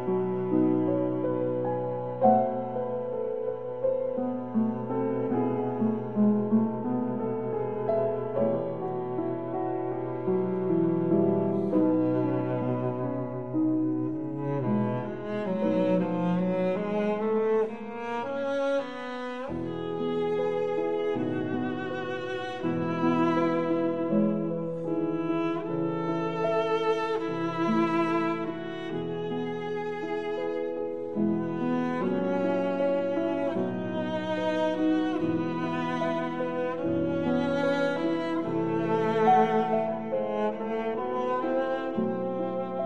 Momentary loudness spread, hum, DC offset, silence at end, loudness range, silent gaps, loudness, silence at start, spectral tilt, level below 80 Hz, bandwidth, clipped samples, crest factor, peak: 7 LU; none; 0.4%; 0 s; 3 LU; none; -28 LUFS; 0 s; -8.5 dB/octave; -66 dBFS; 7.2 kHz; under 0.1%; 20 dB; -8 dBFS